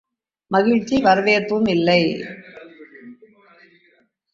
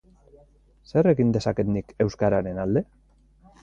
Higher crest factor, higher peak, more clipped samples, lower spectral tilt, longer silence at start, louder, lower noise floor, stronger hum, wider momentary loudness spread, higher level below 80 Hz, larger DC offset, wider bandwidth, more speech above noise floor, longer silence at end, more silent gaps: about the same, 18 dB vs 16 dB; first, -2 dBFS vs -8 dBFS; neither; second, -6 dB/octave vs -8 dB/octave; second, 0.5 s vs 0.95 s; first, -18 LUFS vs -24 LUFS; first, -60 dBFS vs -56 dBFS; neither; first, 14 LU vs 7 LU; second, -56 dBFS vs -48 dBFS; neither; about the same, 7.6 kHz vs 8 kHz; first, 43 dB vs 33 dB; first, 1.2 s vs 0.8 s; neither